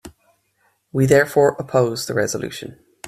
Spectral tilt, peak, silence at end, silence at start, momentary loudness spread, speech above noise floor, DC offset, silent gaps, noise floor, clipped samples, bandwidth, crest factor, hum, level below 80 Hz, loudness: -5.5 dB/octave; -2 dBFS; 0 s; 0.05 s; 15 LU; 47 dB; under 0.1%; none; -65 dBFS; under 0.1%; 16 kHz; 18 dB; none; -54 dBFS; -18 LUFS